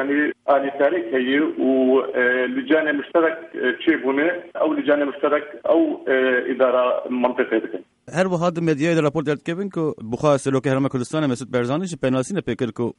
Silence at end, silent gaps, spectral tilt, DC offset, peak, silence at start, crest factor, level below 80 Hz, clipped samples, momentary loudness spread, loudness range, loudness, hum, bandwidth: 0.05 s; none; -6 dB/octave; under 0.1%; -6 dBFS; 0 s; 16 dB; -60 dBFS; under 0.1%; 6 LU; 3 LU; -21 LUFS; none; 11 kHz